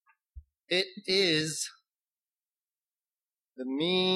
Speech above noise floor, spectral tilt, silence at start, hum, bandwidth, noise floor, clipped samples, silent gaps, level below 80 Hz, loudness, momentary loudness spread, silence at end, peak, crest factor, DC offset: over 61 dB; -3 dB/octave; 0.35 s; none; 13 kHz; under -90 dBFS; under 0.1%; none; -62 dBFS; -29 LUFS; 12 LU; 0 s; -14 dBFS; 20 dB; under 0.1%